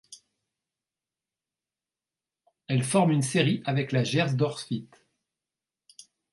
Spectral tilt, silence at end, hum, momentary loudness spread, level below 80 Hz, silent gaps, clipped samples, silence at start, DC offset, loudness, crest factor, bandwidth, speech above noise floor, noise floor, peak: -5.5 dB/octave; 1.45 s; none; 10 LU; -70 dBFS; none; under 0.1%; 0.1 s; under 0.1%; -26 LUFS; 22 dB; 11.5 kHz; over 65 dB; under -90 dBFS; -8 dBFS